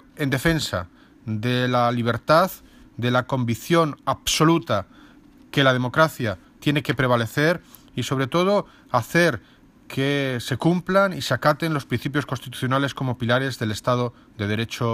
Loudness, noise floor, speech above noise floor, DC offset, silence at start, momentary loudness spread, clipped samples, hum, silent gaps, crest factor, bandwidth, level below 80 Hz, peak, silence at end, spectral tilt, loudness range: -22 LUFS; -50 dBFS; 28 dB; under 0.1%; 0.15 s; 10 LU; under 0.1%; none; none; 20 dB; 15.5 kHz; -52 dBFS; -4 dBFS; 0 s; -5.5 dB/octave; 2 LU